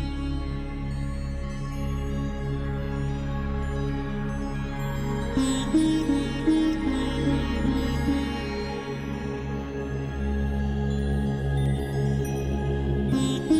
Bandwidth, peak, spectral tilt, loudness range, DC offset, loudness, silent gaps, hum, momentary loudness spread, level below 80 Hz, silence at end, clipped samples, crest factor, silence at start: 14.5 kHz; -12 dBFS; -6.5 dB/octave; 5 LU; under 0.1%; -28 LUFS; none; none; 8 LU; -32 dBFS; 0 s; under 0.1%; 14 dB; 0 s